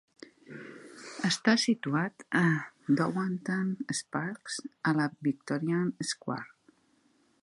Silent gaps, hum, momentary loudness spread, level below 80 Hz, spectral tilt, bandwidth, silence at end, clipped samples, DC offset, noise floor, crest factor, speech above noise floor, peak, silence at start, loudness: none; none; 19 LU; -76 dBFS; -4.5 dB/octave; 11.5 kHz; 0.95 s; under 0.1%; under 0.1%; -68 dBFS; 22 dB; 38 dB; -10 dBFS; 0.5 s; -31 LUFS